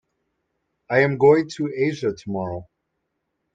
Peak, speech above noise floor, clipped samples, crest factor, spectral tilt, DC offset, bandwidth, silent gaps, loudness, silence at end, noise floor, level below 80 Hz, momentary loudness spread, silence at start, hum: -4 dBFS; 56 dB; under 0.1%; 20 dB; -7 dB/octave; under 0.1%; 7.8 kHz; none; -21 LUFS; 0.9 s; -76 dBFS; -62 dBFS; 13 LU; 0.9 s; none